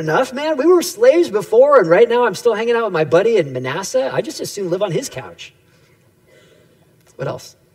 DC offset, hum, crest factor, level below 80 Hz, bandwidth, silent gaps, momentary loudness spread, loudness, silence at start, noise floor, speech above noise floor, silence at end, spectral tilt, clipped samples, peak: under 0.1%; none; 16 dB; -64 dBFS; 16 kHz; none; 16 LU; -15 LUFS; 0 s; -53 dBFS; 38 dB; 0.25 s; -5 dB/octave; under 0.1%; 0 dBFS